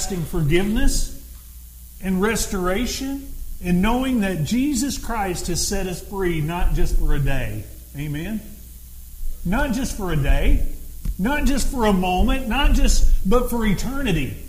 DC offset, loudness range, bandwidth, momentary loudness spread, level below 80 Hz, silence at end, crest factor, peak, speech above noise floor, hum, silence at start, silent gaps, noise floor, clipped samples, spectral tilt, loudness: under 0.1%; 5 LU; 16 kHz; 17 LU; -22 dBFS; 0 s; 16 dB; -4 dBFS; 21 dB; none; 0 s; none; -40 dBFS; under 0.1%; -5 dB/octave; -23 LUFS